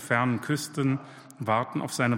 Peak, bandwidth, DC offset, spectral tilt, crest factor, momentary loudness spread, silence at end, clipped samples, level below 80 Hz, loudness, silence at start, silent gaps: -10 dBFS; 16.5 kHz; under 0.1%; -5.5 dB/octave; 18 dB; 9 LU; 0 s; under 0.1%; -70 dBFS; -28 LUFS; 0 s; none